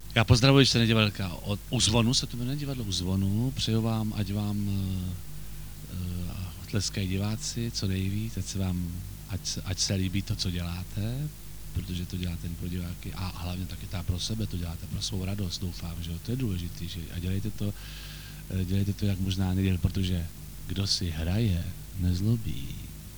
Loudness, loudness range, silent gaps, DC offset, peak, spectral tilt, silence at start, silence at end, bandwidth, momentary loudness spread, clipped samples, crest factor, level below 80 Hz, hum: -29 LUFS; 7 LU; none; 0.4%; -6 dBFS; -5 dB/octave; 0 s; 0 s; over 20 kHz; 13 LU; under 0.1%; 24 dB; -42 dBFS; none